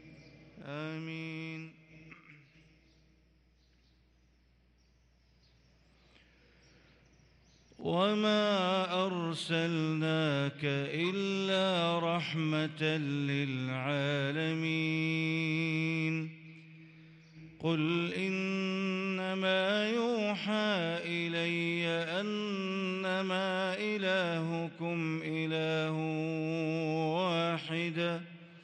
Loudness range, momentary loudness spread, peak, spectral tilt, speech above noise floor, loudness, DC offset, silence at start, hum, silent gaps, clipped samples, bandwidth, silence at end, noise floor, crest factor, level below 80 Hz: 4 LU; 10 LU; -18 dBFS; -6 dB/octave; 35 dB; -33 LUFS; under 0.1%; 0.05 s; none; none; under 0.1%; 10.5 kHz; 0 s; -68 dBFS; 16 dB; -74 dBFS